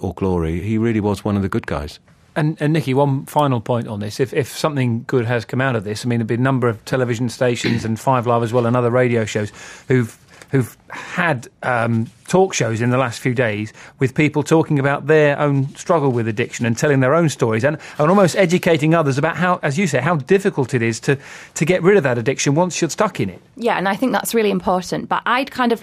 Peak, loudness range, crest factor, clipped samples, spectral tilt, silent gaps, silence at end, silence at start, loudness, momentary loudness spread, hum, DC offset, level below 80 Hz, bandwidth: -2 dBFS; 4 LU; 16 dB; under 0.1%; -6 dB/octave; none; 0 s; 0 s; -18 LUFS; 7 LU; none; under 0.1%; -48 dBFS; 15.5 kHz